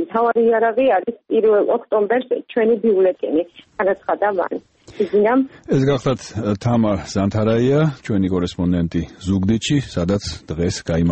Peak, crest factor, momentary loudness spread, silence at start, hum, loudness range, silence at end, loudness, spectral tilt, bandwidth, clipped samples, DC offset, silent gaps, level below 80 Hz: -6 dBFS; 12 dB; 7 LU; 0 s; none; 3 LU; 0 s; -19 LUFS; -6.5 dB/octave; 8.6 kHz; under 0.1%; under 0.1%; none; -42 dBFS